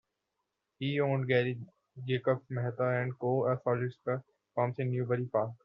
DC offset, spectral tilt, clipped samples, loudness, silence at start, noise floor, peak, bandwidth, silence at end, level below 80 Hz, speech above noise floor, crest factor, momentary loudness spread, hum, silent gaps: under 0.1%; -6 dB/octave; under 0.1%; -32 LUFS; 0.8 s; -85 dBFS; -16 dBFS; 5.4 kHz; 0.1 s; -72 dBFS; 53 dB; 18 dB; 9 LU; none; none